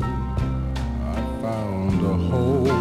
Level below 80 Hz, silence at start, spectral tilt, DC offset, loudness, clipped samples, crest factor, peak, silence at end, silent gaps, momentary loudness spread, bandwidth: -30 dBFS; 0 s; -8 dB/octave; under 0.1%; -24 LUFS; under 0.1%; 12 dB; -10 dBFS; 0 s; none; 7 LU; 13 kHz